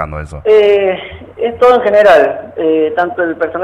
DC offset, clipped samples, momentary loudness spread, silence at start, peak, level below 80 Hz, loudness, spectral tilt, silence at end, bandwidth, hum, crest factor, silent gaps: under 0.1%; under 0.1%; 12 LU; 0 s; 0 dBFS; -38 dBFS; -11 LUFS; -6 dB/octave; 0 s; 9.8 kHz; none; 10 dB; none